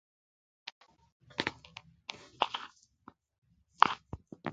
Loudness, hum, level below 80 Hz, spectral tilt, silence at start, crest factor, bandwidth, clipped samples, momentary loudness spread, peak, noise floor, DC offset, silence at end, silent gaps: -34 LUFS; none; -66 dBFS; -3.5 dB/octave; 1.4 s; 38 dB; 9 kHz; under 0.1%; 22 LU; 0 dBFS; -61 dBFS; under 0.1%; 0 s; 3.38-3.42 s